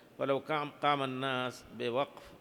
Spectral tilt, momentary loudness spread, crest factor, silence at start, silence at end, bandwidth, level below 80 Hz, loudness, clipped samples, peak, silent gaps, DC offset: -5.5 dB/octave; 8 LU; 20 dB; 0.2 s; 0.05 s; 19.5 kHz; -72 dBFS; -34 LUFS; under 0.1%; -14 dBFS; none; under 0.1%